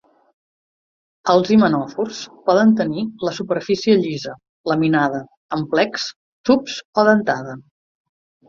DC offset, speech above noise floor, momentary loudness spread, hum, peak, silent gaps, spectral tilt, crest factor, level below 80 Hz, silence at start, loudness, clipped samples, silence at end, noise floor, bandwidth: under 0.1%; over 72 dB; 13 LU; none; -2 dBFS; 4.49-4.64 s, 5.37-5.49 s, 6.16-6.44 s, 6.85-6.93 s; -6 dB/octave; 18 dB; -60 dBFS; 1.25 s; -19 LUFS; under 0.1%; 0.85 s; under -90 dBFS; 7.4 kHz